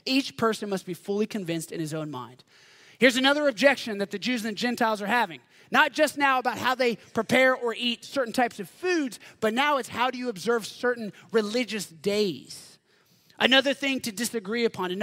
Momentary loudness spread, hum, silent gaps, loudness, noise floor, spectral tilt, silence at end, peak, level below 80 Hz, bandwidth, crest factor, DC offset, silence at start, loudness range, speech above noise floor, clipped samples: 11 LU; none; none; -26 LUFS; -63 dBFS; -3.5 dB/octave; 0 s; -4 dBFS; -74 dBFS; 16 kHz; 24 dB; under 0.1%; 0.05 s; 4 LU; 37 dB; under 0.1%